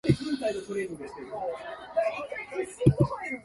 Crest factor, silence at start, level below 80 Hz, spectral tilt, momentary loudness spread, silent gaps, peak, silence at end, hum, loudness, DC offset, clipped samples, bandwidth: 24 dB; 0.05 s; -48 dBFS; -7.5 dB/octave; 12 LU; none; -6 dBFS; 0 s; none; -30 LUFS; under 0.1%; under 0.1%; 11.5 kHz